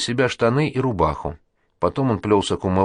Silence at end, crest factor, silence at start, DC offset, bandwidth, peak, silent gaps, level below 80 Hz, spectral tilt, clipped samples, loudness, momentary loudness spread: 0 s; 16 dB; 0 s; under 0.1%; 10.5 kHz; -4 dBFS; none; -42 dBFS; -6 dB/octave; under 0.1%; -21 LUFS; 6 LU